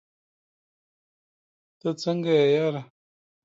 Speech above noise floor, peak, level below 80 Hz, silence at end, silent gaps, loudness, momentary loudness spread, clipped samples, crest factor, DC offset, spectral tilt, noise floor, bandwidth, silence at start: over 67 dB; -10 dBFS; -78 dBFS; 0.6 s; none; -24 LUFS; 12 LU; under 0.1%; 18 dB; under 0.1%; -6.5 dB/octave; under -90 dBFS; 7.8 kHz; 1.85 s